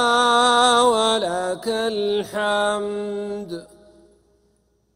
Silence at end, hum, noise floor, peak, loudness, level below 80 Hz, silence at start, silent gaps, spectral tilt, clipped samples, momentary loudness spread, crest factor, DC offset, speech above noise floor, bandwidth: 1.3 s; none; -64 dBFS; -2 dBFS; -19 LUFS; -58 dBFS; 0 s; none; -2.5 dB/octave; under 0.1%; 14 LU; 18 dB; under 0.1%; 40 dB; 16 kHz